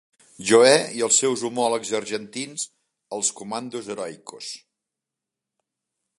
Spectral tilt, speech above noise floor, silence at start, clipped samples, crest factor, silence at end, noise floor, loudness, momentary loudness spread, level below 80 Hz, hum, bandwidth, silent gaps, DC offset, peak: -2 dB/octave; 64 dB; 0.4 s; under 0.1%; 22 dB; 1.6 s; -86 dBFS; -22 LUFS; 19 LU; -72 dBFS; none; 11.5 kHz; none; under 0.1%; -2 dBFS